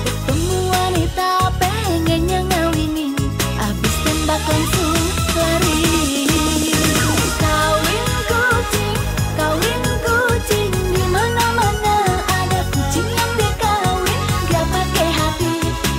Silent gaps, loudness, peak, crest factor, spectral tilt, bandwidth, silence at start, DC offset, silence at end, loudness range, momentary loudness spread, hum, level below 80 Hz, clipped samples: none; -17 LUFS; -6 dBFS; 12 dB; -4 dB/octave; 16.5 kHz; 0 s; under 0.1%; 0 s; 2 LU; 4 LU; none; -26 dBFS; under 0.1%